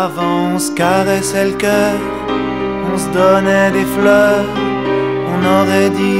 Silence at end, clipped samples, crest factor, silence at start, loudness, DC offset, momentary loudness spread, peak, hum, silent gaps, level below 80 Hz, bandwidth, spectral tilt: 0 s; under 0.1%; 14 dB; 0 s; -14 LUFS; 0.5%; 7 LU; 0 dBFS; none; none; -42 dBFS; 16.5 kHz; -5 dB/octave